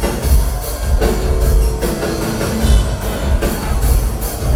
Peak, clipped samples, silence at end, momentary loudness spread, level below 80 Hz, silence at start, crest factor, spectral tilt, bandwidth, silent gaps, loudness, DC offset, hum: 0 dBFS; under 0.1%; 0 s; 5 LU; -16 dBFS; 0 s; 14 dB; -5.5 dB/octave; 16.5 kHz; none; -17 LUFS; under 0.1%; none